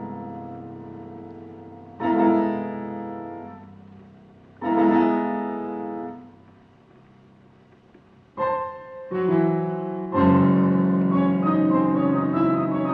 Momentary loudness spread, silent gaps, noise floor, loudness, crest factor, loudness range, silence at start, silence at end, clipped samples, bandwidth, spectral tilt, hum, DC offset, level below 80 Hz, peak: 21 LU; none; -53 dBFS; -22 LUFS; 18 dB; 13 LU; 0 s; 0 s; under 0.1%; 4.6 kHz; -11 dB/octave; none; under 0.1%; -60 dBFS; -6 dBFS